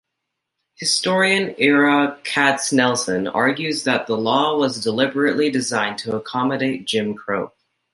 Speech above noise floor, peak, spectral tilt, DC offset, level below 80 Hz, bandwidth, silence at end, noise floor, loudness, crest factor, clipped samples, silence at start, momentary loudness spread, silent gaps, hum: 60 dB; -2 dBFS; -3.5 dB/octave; under 0.1%; -64 dBFS; 11.5 kHz; 0.45 s; -79 dBFS; -19 LUFS; 18 dB; under 0.1%; 0.8 s; 8 LU; none; none